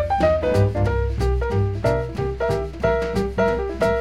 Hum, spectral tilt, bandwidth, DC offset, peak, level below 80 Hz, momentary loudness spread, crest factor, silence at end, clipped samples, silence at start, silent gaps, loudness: none; -7.5 dB/octave; 12.5 kHz; 0.6%; -6 dBFS; -28 dBFS; 5 LU; 14 dB; 0 s; under 0.1%; 0 s; none; -22 LUFS